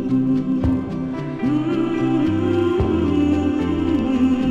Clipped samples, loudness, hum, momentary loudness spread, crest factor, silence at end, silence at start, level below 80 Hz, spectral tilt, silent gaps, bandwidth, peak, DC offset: under 0.1%; -20 LUFS; none; 5 LU; 12 dB; 0 s; 0 s; -36 dBFS; -8.5 dB/octave; none; 7.8 kHz; -8 dBFS; under 0.1%